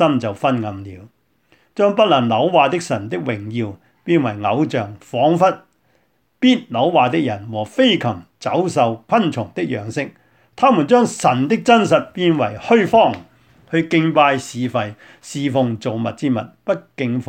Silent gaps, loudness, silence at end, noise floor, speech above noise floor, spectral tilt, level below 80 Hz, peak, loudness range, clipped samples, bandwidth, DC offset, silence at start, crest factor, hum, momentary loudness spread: none; -17 LUFS; 0.05 s; -63 dBFS; 46 dB; -6 dB/octave; -60 dBFS; 0 dBFS; 4 LU; under 0.1%; 10.5 kHz; under 0.1%; 0 s; 16 dB; none; 12 LU